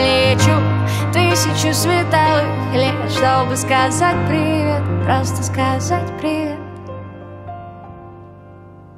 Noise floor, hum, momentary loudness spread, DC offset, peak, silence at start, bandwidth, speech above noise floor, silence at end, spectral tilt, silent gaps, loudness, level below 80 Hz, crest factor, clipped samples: -39 dBFS; none; 19 LU; under 0.1%; 0 dBFS; 0 s; 15.5 kHz; 23 dB; 0 s; -5 dB/octave; none; -16 LUFS; -44 dBFS; 16 dB; under 0.1%